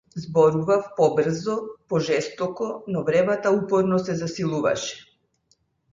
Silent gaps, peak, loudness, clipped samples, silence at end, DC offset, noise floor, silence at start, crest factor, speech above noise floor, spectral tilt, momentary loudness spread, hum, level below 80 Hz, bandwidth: none; -6 dBFS; -23 LUFS; under 0.1%; 0.9 s; under 0.1%; -67 dBFS; 0.15 s; 18 dB; 45 dB; -6 dB/octave; 9 LU; none; -60 dBFS; 7.6 kHz